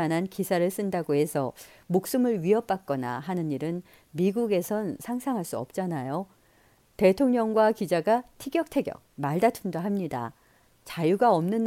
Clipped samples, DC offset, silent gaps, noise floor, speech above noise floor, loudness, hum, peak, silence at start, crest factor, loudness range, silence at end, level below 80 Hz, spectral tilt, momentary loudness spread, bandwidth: under 0.1%; under 0.1%; none; -62 dBFS; 35 dB; -27 LUFS; none; -8 dBFS; 0 s; 18 dB; 4 LU; 0 s; -64 dBFS; -6.5 dB/octave; 11 LU; 17 kHz